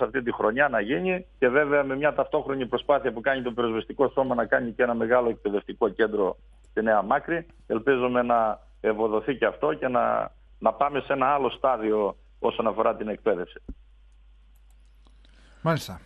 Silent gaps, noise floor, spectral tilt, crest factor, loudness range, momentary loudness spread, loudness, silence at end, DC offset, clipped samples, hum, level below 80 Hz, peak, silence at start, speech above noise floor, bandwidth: none; -54 dBFS; -6.5 dB/octave; 20 dB; 4 LU; 7 LU; -25 LUFS; 0.05 s; under 0.1%; under 0.1%; none; -52 dBFS; -6 dBFS; 0 s; 29 dB; 11.5 kHz